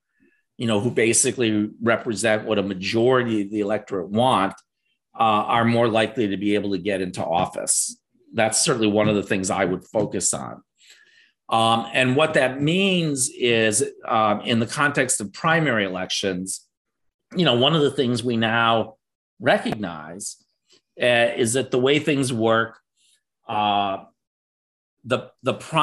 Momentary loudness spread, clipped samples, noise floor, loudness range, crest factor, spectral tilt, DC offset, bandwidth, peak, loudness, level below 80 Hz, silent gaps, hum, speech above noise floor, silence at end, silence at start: 9 LU; under 0.1%; -65 dBFS; 3 LU; 18 dB; -3.5 dB/octave; under 0.1%; 13 kHz; -4 dBFS; -21 LUFS; -62 dBFS; 16.77-16.85 s, 17.14-17.19 s, 19.15-19.37 s, 24.27-24.97 s; none; 43 dB; 0 s; 0.6 s